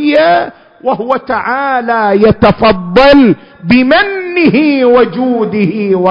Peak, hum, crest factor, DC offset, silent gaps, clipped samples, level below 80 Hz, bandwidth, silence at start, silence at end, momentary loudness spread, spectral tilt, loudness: 0 dBFS; none; 8 dB; under 0.1%; none; 0.4%; -36 dBFS; 6.6 kHz; 0 s; 0 s; 7 LU; -8 dB/octave; -9 LUFS